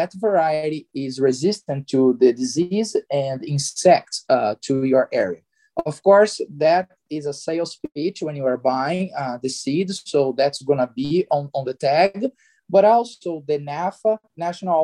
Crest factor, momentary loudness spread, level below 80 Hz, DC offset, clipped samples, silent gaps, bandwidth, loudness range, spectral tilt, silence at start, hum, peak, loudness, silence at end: 18 dB; 11 LU; -66 dBFS; under 0.1%; under 0.1%; none; 12 kHz; 4 LU; -5.5 dB/octave; 0 s; none; -2 dBFS; -21 LUFS; 0 s